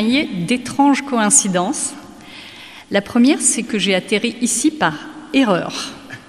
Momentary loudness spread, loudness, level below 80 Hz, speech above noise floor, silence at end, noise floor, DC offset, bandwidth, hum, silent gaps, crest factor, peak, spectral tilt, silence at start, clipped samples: 22 LU; -16 LUFS; -56 dBFS; 21 dB; 0.1 s; -38 dBFS; 0.1%; 15 kHz; none; none; 18 dB; 0 dBFS; -3 dB/octave; 0 s; under 0.1%